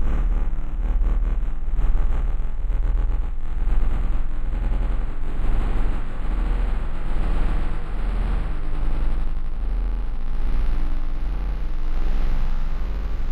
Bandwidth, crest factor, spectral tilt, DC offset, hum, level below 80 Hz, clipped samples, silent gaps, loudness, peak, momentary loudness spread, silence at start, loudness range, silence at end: 4.1 kHz; 12 dB; -8 dB/octave; under 0.1%; none; -20 dBFS; under 0.1%; none; -28 LUFS; -8 dBFS; 5 LU; 0 s; 2 LU; 0 s